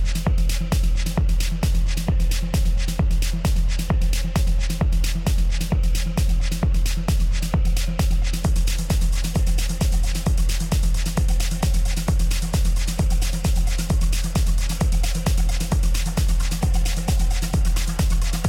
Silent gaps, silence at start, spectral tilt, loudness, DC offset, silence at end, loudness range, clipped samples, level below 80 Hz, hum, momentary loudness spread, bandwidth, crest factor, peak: none; 0 s; -5 dB/octave; -23 LUFS; under 0.1%; 0 s; 0 LU; under 0.1%; -20 dBFS; none; 1 LU; 16.5 kHz; 10 dB; -8 dBFS